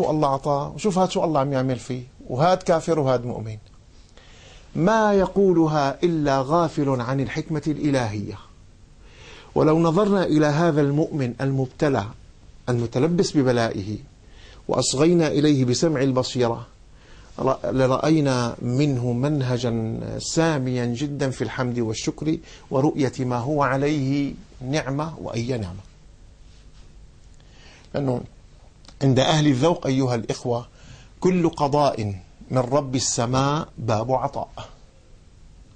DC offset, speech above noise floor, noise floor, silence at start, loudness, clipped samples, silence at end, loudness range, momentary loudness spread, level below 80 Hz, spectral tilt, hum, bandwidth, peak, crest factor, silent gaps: under 0.1%; 28 dB; -49 dBFS; 0 s; -22 LUFS; under 0.1%; 0.3 s; 4 LU; 12 LU; -48 dBFS; -6 dB/octave; none; 9.8 kHz; -6 dBFS; 16 dB; none